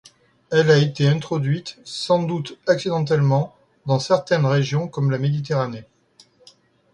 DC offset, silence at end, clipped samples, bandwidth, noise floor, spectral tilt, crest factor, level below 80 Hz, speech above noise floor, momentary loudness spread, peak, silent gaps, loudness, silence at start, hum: under 0.1%; 1.1 s; under 0.1%; 10.5 kHz; -55 dBFS; -6.5 dB/octave; 18 dB; -60 dBFS; 36 dB; 11 LU; -2 dBFS; none; -21 LUFS; 0.5 s; none